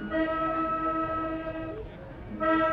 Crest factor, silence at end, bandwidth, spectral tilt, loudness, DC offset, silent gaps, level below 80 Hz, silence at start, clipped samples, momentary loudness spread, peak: 14 dB; 0 s; 5 kHz; -8.5 dB/octave; -29 LUFS; under 0.1%; none; -48 dBFS; 0 s; under 0.1%; 14 LU; -16 dBFS